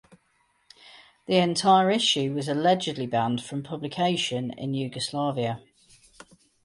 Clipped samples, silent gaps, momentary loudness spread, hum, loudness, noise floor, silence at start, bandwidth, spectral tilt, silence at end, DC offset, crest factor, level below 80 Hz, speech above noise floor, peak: under 0.1%; none; 12 LU; none; -25 LUFS; -68 dBFS; 0.95 s; 11.5 kHz; -4.5 dB/octave; 1.05 s; under 0.1%; 18 dB; -68 dBFS; 43 dB; -8 dBFS